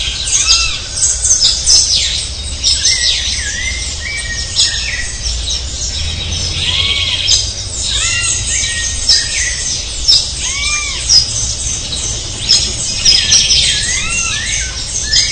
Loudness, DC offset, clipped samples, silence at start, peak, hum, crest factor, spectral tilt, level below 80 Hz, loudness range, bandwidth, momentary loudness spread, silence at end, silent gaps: -11 LUFS; 0.3%; 0.1%; 0 s; 0 dBFS; none; 14 dB; 0 dB/octave; -26 dBFS; 4 LU; 12 kHz; 10 LU; 0 s; none